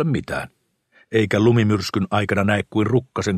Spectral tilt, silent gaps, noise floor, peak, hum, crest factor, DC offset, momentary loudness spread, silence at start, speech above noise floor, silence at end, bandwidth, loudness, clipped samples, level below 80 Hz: -6.5 dB/octave; none; -58 dBFS; -4 dBFS; none; 16 dB; under 0.1%; 10 LU; 0 s; 39 dB; 0 s; 13.5 kHz; -20 LUFS; under 0.1%; -50 dBFS